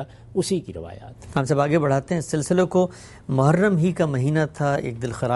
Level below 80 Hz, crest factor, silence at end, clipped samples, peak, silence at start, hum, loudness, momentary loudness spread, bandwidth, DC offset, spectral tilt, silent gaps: -50 dBFS; 16 dB; 0 s; under 0.1%; -6 dBFS; 0 s; none; -22 LUFS; 11 LU; 11.5 kHz; under 0.1%; -6.5 dB/octave; none